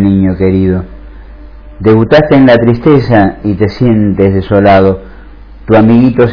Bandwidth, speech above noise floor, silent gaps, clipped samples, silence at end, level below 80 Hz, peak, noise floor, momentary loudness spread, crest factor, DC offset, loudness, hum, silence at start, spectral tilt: 5.4 kHz; 24 dB; none; 4%; 0 s; -30 dBFS; 0 dBFS; -30 dBFS; 8 LU; 8 dB; under 0.1%; -8 LUFS; none; 0 s; -9.5 dB/octave